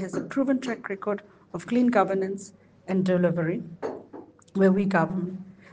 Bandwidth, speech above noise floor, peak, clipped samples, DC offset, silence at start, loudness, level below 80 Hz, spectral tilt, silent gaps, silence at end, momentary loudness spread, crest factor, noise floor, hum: 9.2 kHz; 22 dB; -6 dBFS; under 0.1%; under 0.1%; 0 s; -26 LUFS; -66 dBFS; -7.5 dB/octave; none; 0.2 s; 19 LU; 20 dB; -47 dBFS; none